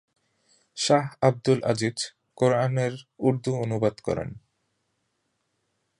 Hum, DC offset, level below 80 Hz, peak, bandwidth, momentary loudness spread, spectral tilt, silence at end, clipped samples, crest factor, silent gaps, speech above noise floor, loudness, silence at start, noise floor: none; under 0.1%; -60 dBFS; -6 dBFS; 11 kHz; 10 LU; -5.5 dB/octave; 1.6 s; under 0.1%; 22 dB; none; 51 dB; -25 LUFS; 0.75 s; -76 dBFS